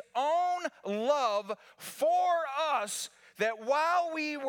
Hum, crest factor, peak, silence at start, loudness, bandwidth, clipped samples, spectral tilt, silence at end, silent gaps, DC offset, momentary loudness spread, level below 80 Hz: none; 16 dB; -16 dBFS; 0.15 s; -30 LUFS; 19 kHz; under 0.1%; -2.5 dB/octave; 0 s; none; under 0.1%; 10 LU; -90 dBFS